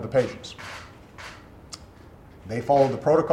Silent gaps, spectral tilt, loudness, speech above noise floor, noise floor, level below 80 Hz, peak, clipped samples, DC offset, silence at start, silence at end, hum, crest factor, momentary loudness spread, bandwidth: none; -6.5 dB/octave; -24 LUFS; 26 dB; -48 dBFS; -54 dBFS; -8 dBFS; under 0.1%; under 0.1%; 0 s; 0 s; none; 18 dB; 23 LU; 13 kHz